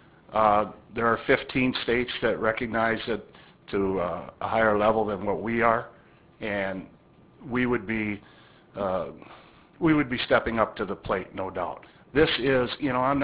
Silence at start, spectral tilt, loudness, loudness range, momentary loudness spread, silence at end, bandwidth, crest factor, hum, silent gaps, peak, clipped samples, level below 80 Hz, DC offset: 0.3 s; -9.5 dB/octave; -26 LUFS; 5 LU; 11 LU; 0 s; 4 kHz; 22 dB; none; none; -6 dBFS; under 0.1%; -50 dBFS; under 0.1%